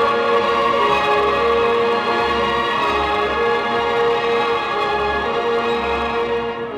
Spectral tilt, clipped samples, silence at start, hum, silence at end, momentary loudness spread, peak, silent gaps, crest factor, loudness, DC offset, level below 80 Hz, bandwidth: -4.5 dB/octave; under 0.1%; 0 s; none; 0 s; 4 LU; -4 dBFS; none; 12 dB; -18 LUFS; under 0.1%; -42 dBFS; 11.5 kHz